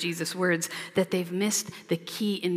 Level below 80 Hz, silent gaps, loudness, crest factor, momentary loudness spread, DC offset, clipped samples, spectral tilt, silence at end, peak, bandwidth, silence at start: -74 dBFS; none; -28 LUFS; 16 dB; 5 LU; under 0.1%; under 0.1%; -4 dB/octave; 0 s; -12 dBFS; 16 kHz; 0 s